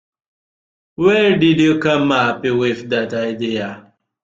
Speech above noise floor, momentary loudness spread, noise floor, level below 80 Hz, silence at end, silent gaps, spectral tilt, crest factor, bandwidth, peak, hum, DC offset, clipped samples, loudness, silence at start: over 74 dB; 9 LU; under -90 dBFS; -56 dBFS; 0.45 s; none; -6 dB/octave; 16 dB; 7.6 kHz; -2 dBFS; none; under 0.1%; under 0.1%; -16 LUFS; 1 s